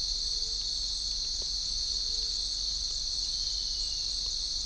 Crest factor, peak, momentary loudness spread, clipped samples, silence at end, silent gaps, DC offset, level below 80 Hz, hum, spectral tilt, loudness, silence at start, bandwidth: 14 dB; -20 dBFS; 1 LU; under 0.1%; 0 s; none; under 0.1%; -44 dBFS; none; 0.5 dB/octave; -30 LUFS; 0 s; 10.5 kHz